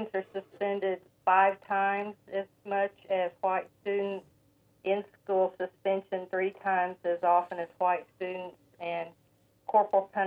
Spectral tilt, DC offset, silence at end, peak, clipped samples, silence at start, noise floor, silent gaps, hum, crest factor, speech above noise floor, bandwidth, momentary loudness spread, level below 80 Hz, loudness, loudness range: -7 dB/octave; under 0.1%; 0 s; -12 dBFS; under 0.1%; 0 s; -67 dBFS; none; none; 18 dB; 37 dB; 4.8 kHz; 12 LU; -80 dBFS; -31 LUFS; 3 LU